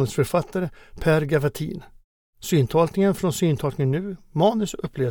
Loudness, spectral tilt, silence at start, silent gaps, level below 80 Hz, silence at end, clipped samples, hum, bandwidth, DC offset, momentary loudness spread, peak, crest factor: -23 LUFS; -6.5 dB/octave; 0 s; 2.04-2.33 s; -46 dBFS; 0 s; under 0.1%; none; 19.5 kHz; under 0.1%; 11 LU; -6 dBFS; 16 dB